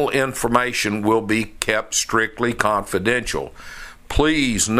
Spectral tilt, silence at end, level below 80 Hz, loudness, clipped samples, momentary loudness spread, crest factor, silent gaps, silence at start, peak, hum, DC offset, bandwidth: -3.5 dB/octave; 0 s; -36 dBFS; -20 LUFS; under 0.1%; 9 LU; 20 dB; none; 0 s; 0 dBFS; none; under 0.1%; 16 kHz